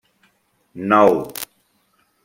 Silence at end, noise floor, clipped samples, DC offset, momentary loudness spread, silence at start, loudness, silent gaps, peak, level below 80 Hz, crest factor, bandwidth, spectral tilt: 0.8 s; -63 dBFS; under 0.1%; under 0.1%; 18 LU; 0.75 s; -17 LUFS; none; -2 dBFS; -62 dBFS; 20 dB; 16.5 kHz; -5.5 dB/octave